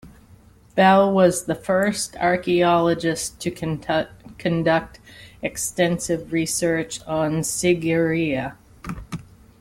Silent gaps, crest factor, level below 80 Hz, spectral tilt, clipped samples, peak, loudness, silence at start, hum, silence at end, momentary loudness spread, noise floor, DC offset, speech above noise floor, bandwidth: none; 18 dB; -50 dBFS; -4.5 dB/octave; under 0.1%; -4 dBFS; -21 LUFS; 0.05 s; none; 0.4 s; 16 LU; -50 dBFS; under 0.1%; 30 dB; 16.5 kHz